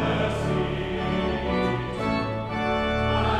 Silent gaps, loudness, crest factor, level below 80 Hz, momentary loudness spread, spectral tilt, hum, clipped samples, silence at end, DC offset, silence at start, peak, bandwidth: none; -26 LUFS; 14 dB; -36 dBFS; 4 LU; -7 dB/octave; none; under 0.1%; 0 s; under 0.1%; 0 s; -12 dBFS; 11.5 kHz